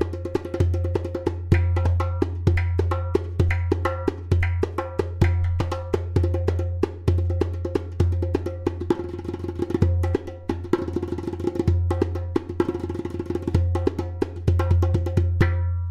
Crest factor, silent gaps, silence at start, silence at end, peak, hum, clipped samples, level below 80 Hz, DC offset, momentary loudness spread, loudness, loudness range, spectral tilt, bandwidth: 18 dB; none; 0 s; 0 s; -4 dBFS; none; under 0.1%; -34 dBFS; under 0.1%; 7 LU; -25 LUFS; 2 LU; -8.5 dB/octave; 7.2 kHz